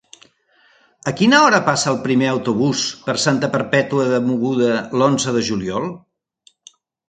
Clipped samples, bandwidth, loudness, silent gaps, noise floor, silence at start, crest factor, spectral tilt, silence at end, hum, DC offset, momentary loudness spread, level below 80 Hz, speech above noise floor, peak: under 0.1%; 9.6 kHz; -17 LUFS; none; -57 dBFS; 1.05 s; 18 dB; -4.5 dB/octave; 1.1 s; none; under 0.1%; 9 LU; -58 dBFS; 40 dB; 0 dBFS